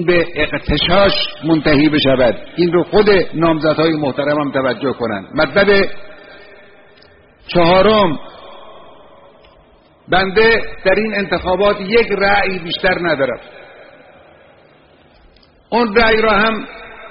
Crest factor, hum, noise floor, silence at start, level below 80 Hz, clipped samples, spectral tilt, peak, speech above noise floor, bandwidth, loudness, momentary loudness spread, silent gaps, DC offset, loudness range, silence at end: 16 dB; none; -48 dBFS; 0 s; -34 dBFS; under 0.1%; -3 dB/octave; 0 dBFS; 34 dB; 5.4 kHz; -14 LUFS; 8 LU; none; under 0.1%; 5 LU; 0 s